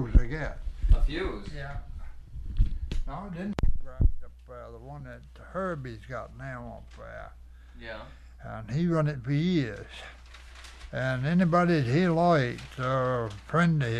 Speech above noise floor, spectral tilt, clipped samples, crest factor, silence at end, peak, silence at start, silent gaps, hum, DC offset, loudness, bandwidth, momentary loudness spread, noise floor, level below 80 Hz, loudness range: 18 dB; -7.5 dB/octave; under 0.1%; 24 dB; 0 s; -4 dBFS; 0 s; none; none; under 0.1%; -29 LUFS; 9.4 kHz; 22 LU; -47 dBFS; -32 dBFS; 13 LU